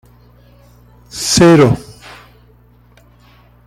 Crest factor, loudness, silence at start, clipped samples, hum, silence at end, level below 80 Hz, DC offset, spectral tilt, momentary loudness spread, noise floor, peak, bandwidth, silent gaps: 16 dB; -10 LUFS; 1.15 s; under 0.1%; 60 Hz at -40 dBFS; 1.85 s; -42 dBFS; under 0.1%; -5 dB/octave; 23 LU; -47 dBFS; 0 dBFS; 15 kHz; none